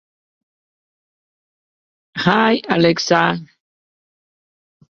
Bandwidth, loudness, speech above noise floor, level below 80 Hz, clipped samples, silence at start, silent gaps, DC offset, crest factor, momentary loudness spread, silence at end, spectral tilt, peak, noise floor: 7.2 kHz; -16 LUFS; over 75 dB; -60 dBFS; under 0.1%; 2.15 s; none; under 0.1%; 20 dB; 10 LU; 1.5 s; -5 dB/octave; -2 dBFS; under -90 dBFS